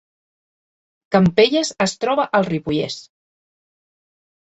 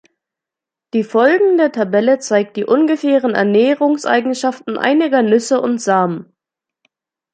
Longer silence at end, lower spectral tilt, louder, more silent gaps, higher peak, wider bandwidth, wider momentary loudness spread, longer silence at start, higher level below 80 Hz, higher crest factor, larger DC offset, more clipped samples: first, 1.5 s vs 1.1 s; about the same, -5 dB/octave vs -5 dB/octave; second, -18 LUFS vs -15 LUFS; neither; about the same, -2 dBFS vs -2 dBFS; second, 8.2 kHz vs 9.4 kHz; about the same, 9 LU vs 7 LU; first, 1.1 s vs 0.95 s; first, -54 dBFS vs -68 dBFS; first, 20 dB vs 14 dB; neither; neither